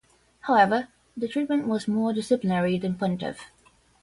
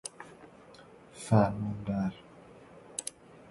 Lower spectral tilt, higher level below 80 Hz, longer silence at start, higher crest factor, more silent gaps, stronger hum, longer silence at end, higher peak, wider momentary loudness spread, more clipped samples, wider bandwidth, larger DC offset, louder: about the same, -6.5 dB/octave vs -6.5 dB/octave; about the same, -62 dBFS vs -58 dBFS; first, 0.45 s vs 0.05 s; about the same, 20 dB vs 24 dB; neither; neither; first, 0.55 s vs 0.15 s; first, -6 dBFS vs -10 dBFS; second, 14 LU vs 27 LU; neither; about the same, 11.5 kHz vs 12 kHz; neither; first, -25 LUFS vs -32 LUFS